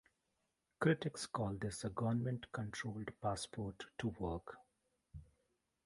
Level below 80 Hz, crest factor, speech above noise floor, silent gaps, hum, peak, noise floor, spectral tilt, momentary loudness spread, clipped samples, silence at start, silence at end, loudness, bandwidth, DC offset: -62 dBFS; 24 dB; 44 dB; none; none; -20 dBFS; -85 dBFS; -5.5 dB/octave; 21 LU; under 0.1%; 0.8 s; 0.6 s; -42 LUFS; 11.5 kHz; under 0.1%